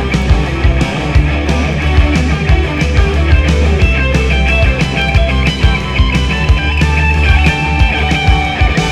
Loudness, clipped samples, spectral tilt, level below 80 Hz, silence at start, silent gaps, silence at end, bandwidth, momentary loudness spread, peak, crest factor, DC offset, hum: -12 LUFS; 0.2%; -6 dB/octave; -14 dBFS; 0 s; none; 0 s; 10.5 kHz; 2 LU; 0 dBFS; 10 dB; under 0.1%; none